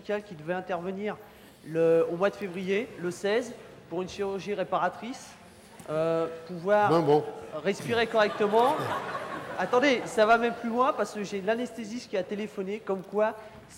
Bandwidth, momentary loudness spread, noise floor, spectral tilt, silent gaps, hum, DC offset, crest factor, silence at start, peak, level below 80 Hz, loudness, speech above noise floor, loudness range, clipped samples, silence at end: 16.5 kHz; 12 LU; -50 dBFS; -5.5 dB/octave; none; none; under 0.1%; 16 dB; 0 s; -12 dBFS; -66 dBFS; -28 LUFS; 22 dB; 6 LU; under 0.1%; 0 s